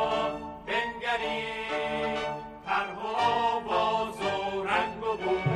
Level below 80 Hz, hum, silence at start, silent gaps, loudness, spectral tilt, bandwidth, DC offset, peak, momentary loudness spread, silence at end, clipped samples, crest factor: -56 dBFS; none; 0 s; none; -29 LUFS; -5 dB/octave; 12.5 kHz; under 0.1%; -14 dBFS; 5 LU; 0 s; under 0.1%; 16 dB